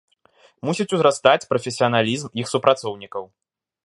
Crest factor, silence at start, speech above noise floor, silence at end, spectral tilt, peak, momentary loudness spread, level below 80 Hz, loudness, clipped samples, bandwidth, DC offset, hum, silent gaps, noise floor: 22 dB; 0.65 s; 37 dB; 0.6 s; -4.5 dB/octave; 0 dBFS; 14 LU; -64 dBFS; -20 LUFS; under 0.1%; 11.5 kHz; under 0.1%; none; none; -57 dBFS